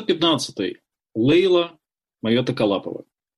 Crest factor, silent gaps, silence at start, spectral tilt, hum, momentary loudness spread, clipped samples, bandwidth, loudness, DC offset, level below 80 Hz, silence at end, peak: 14 dB; none; 0 s; -5.5 dB/octave; none; 14 LU; under 0.1%; 12 kHz; -21 LUFS; under 0.1%; -60 dBFS; 0.35 s; -8 dBFS